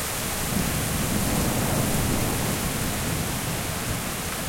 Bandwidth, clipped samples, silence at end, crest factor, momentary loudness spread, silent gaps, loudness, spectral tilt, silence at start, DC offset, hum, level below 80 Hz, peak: 16.5 kHz; under 0.1%; 0 s; 14 dB; 4 LU; none; -25 LUFS; -4 dB/octave; 0 s; under 0.1%; none; -36 dBFS; -12 dBFS